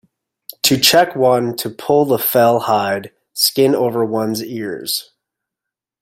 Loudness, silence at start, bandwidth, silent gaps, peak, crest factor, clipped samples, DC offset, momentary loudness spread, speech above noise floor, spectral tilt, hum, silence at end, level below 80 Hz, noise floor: -15 LUFS; 0.65 s; 16.5 kHz; none; 0 dBFS; 16 dB; under 0.1%; under 0.1%; 12 LU; 69 dB; -3.5 dB/octave; none; 1 s; -60 dBFS; -84 dBFS